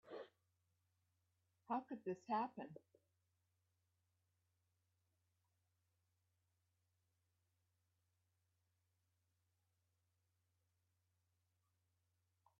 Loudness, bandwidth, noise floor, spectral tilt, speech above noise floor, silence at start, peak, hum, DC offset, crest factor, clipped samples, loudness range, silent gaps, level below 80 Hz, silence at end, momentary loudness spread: -47 LUFS; 5.6 kHz; -86 dBFS; -5 dB/octave; 40 dB; 0.05 s; -30 dBFS; none; under 0.1%; 26 dB; under 0.1%; 5 LU; none; under -90 dBFS; 9.8 s; 16 LU